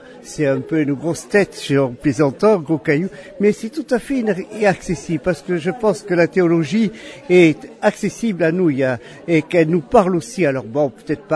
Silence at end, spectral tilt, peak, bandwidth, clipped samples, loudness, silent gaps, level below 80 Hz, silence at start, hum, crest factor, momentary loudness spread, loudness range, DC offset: 0 s; -6.5 dB/octave; 0 dBFS; 11 kHz; under 0.1%; -18 LUFS; none; -50 dBFS; 0.1 s; none; 18 dB; 7 LU; 2 LU; under 0.1%